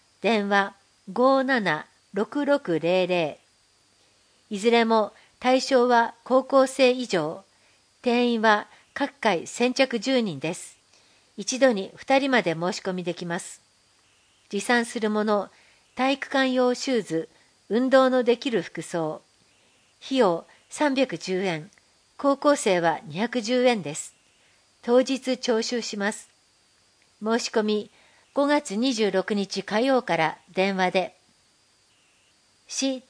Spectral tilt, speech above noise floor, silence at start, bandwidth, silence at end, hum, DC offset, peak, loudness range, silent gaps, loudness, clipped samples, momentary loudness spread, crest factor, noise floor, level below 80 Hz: -4 dB/octave; 39 dB; 0.25 s; 10.5 kHz; 0.1 s; none; under 0.1%; -4 dBFS; 5 LU; none; -24 LUFS; under 0.1%; 12 LU; 20 dB; -63 dBFS; -74 dBFS